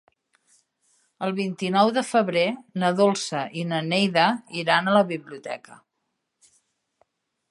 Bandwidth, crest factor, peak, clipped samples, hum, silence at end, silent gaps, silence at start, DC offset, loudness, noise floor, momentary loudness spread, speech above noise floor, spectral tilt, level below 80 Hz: 11.5 kHz; 20 dB; -4 dBFS; under 0.1%; none; 1.75 s; none; 1.2 s; under 0.1%; -23 LUFS; -78 dBFS; 12 LU; 55 dB; -5 dB/octave; -76 dBFS